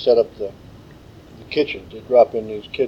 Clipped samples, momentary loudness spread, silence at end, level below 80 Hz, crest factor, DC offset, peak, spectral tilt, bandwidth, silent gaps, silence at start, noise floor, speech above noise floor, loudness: under 0.1%; 16 LU; 0 s; -50 dBFS; 18 dB; under 0.1%; -2 dBFS; -6.5 dB/octave; 6.8 kHz; none; 0 s; -43 dBFS; 24 dB; -20 LUFS